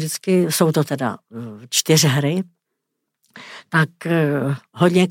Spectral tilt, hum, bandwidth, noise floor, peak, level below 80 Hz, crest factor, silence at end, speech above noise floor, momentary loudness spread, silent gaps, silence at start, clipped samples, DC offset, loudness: -4.5 dB/octave; none; 16.5 kHz; -78 dBFS; -2 dBFS; -66 dBFS; 18 dB; 0 s; 59 dB; 19 LU; none; 0 s; under 0.1%; under 0.1%; -19 LUFS